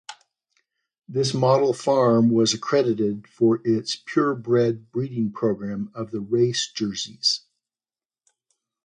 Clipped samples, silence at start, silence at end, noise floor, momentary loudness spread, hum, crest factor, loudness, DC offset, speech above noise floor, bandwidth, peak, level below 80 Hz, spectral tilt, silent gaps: under 0.1%; 0.1 s; 1.45 s; under -90 dBFS; 10 LU; none; 18 dB; -22 LUFS; under 0.1%; over 68 dB; 10.5 kHz; -6 dBFS; -64 dBFS; -5 dB/octave; 0.98-1.02 s